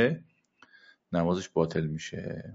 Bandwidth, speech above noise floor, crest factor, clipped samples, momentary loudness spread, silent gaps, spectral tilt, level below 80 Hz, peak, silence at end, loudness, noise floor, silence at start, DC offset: 7.8 kHz; 32 dB; 20 dB; under 0.1%; 9 LU; none; -6 dB/octave; -58 dBFS; -12 dBFS; 0 s; -31 LUFS; -62 dBFS; 0 s; under 0.1%